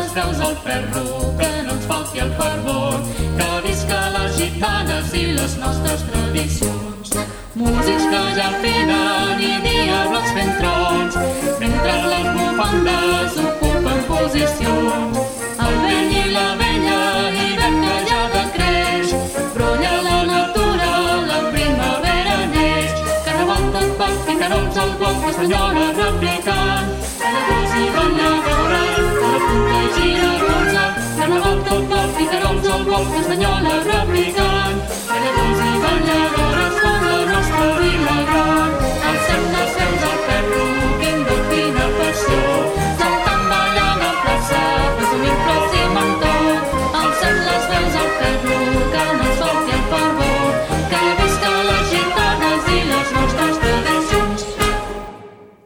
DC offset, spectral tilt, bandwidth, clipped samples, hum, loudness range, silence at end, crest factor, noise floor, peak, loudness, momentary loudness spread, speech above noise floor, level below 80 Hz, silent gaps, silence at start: under 0.1%; -4.5 dB/octave; 18.5 kHz; under 0.1%; none; 3 LU; 0.2 s; 16 dB; -40 dBFS; -2 dBFS; -17 LUFS; 4 LU; 23 dB; -26 dBFS; none; 0 s